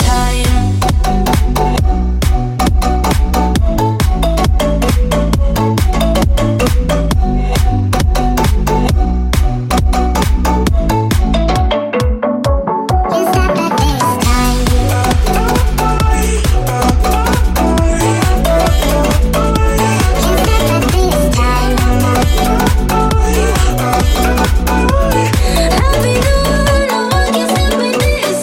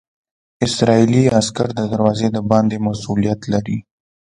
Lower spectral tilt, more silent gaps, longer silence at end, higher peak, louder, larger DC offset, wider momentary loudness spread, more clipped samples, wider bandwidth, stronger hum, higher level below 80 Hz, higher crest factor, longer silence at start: about the same, -5.5 dB/octave vs -6 dB/octave; neither; second, 0 s vs 0.55 s; about the same, 0 dBFS vs 0 dBFS; first, -13 LUFS vs -17 LUFS; neither; second, 2 LU vs 8 LU; neither; first, 17 kHz vs 11 kHz; neither; first, -14 dBFS vs -46 dBFS; second, 10 dB vs 18 dB; second, 0 s vs 0.6 s